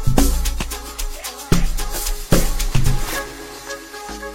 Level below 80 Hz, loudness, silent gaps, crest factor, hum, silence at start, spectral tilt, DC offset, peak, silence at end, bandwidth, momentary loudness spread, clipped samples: -22 dBFS; -23 LUFS; none; 18 dB; none; 0 s; -4.5 dB/octave; under 0.1%; 0 dBFS; 0 s; 16.5 kHz; 12 LU; under 0.1%